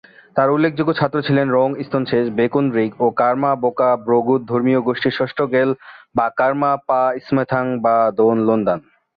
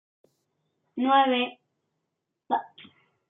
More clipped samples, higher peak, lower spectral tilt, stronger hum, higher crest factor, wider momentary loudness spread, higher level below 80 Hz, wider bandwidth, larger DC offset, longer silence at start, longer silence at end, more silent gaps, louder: neither; first, -2 dBFS vs -8 dBFS; first, -10 dB/octave vs -6.5 dB/octave; neither; second, 14 dB vs 22 dB; second, 5 LU vs 11 LU; first, -58 dBFS vs -88 dBFS; first, 5 kHz vs 3.9 kHz; neither; second, 0.35 s vs 0.95 s; second, 0.4 s vs 0.65 s; neither; first, -18 LUFS vs -25 LUFS